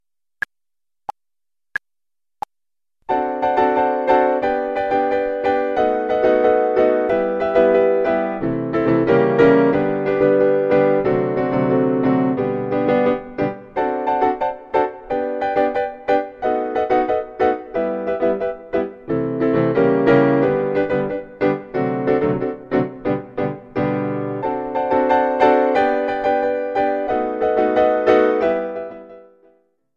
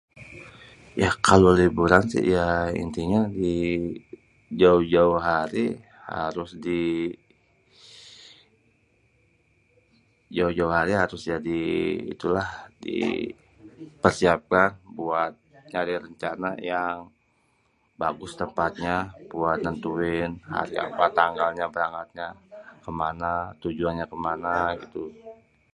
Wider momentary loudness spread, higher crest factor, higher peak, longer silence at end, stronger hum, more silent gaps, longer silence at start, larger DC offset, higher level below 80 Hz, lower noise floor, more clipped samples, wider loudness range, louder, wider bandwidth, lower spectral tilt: second, 9 LU vs 17 LU; second, 18 dB vs 26 dB; about the same, 0 dBFS vs 0 dBFS; first, 0.75 s vs 0.4 s; neither; neither; first, 3.1 s vs 0.15 s; neither; about the same, -50 dBFS vs -48 dBFS; first, under -90 dBFS vs -67 dBFS; neither; second, 5 LU vs 10 LU; first, -18 LUFS vs -25 LUFS; second, 6.6 kHz vs 11.5 kHz; first, -8.5 dB/octave vs -6 dB/octave